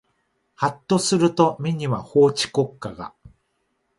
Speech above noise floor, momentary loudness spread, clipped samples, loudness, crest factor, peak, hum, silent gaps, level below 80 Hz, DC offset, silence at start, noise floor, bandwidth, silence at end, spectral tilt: 51 dB; 16 LU; under 0.1%; -21 LUFS; 18 dB; -4 dBFS; none; none; -58 dBFS; under 0.1%; 0.6 s; -71 dBFS; 11.5 kHz; 0.7 s; -5 dB/octave